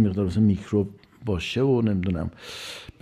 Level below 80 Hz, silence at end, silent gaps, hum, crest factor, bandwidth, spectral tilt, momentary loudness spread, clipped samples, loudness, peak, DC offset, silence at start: -50 dBFS; 0.15 s; none; none; 14 dB; 13.5 kHz; -7.5 dB/octave; 14 LU; under 0.1%; -25 LUFS; -10 dBFS; under 0.1%; 0 s